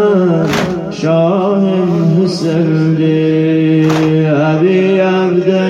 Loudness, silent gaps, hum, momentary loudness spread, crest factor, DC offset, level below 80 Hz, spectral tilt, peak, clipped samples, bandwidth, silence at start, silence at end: -12 LUFS; none; none; 3 LU; 10 dB; under 0.1%; -48 dBFS; -7.5 dB/octave; 0 dBFS; under 0.1%; 9.6 kHz; 0 s; 0 s